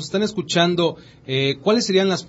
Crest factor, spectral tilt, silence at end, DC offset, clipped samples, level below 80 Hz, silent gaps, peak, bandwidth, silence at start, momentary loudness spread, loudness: 16 dB; -4.5 dB/octave; 0 s; under 0.1%; under 0.1%; -60 dBFS; none; -4 dBFS; 8 kHz; 0 s; 7 LU; -20 LUFS